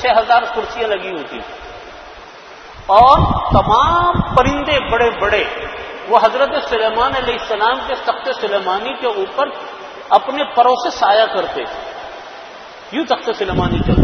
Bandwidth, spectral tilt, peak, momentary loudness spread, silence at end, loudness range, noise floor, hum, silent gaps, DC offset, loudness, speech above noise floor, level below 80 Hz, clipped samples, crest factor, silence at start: 6.6 kHz; -6 dB/octave; 0 dBFS; 20 LU; 0 s; 5 LU; -36 dBFS; none; none; under 0.1%; -15 LUFS; 21 dB; -32 dBFS; under 0.1%; 16 dB; 0 s